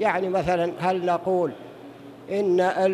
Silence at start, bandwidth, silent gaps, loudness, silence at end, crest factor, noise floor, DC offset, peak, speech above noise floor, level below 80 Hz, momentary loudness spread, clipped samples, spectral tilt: 0 s; 12 kHz; none; -24 LUFS; 0 s; 16 dB; -43 dBFS; under 0.1%; -8 dBFS; 20 dB; -56 dBFS; 21 LU; under 0.1%; -6.5 dB/octave